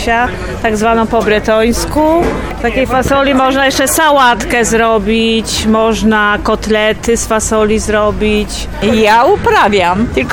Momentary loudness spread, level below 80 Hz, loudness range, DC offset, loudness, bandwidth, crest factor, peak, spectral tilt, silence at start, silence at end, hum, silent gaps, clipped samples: 5 LU; -26 dBFS; 2 LU; under 0.1%; -11 LUFS; 18.5 kHz; 10 dB; -2 dBFS; -4 dB/octave; 0 s; 0 s; none; none; under 0.1%